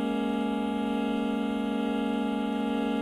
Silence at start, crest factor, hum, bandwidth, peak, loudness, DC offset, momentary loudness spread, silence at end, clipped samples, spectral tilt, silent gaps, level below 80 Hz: 0 s; 10 dB; none; 13 kHz; -18 dBFS; -29 LUFS; under 0.1%; 1 LU; 0 s; under 0.1%; -6.5 dB/octave; none; -56 dBFS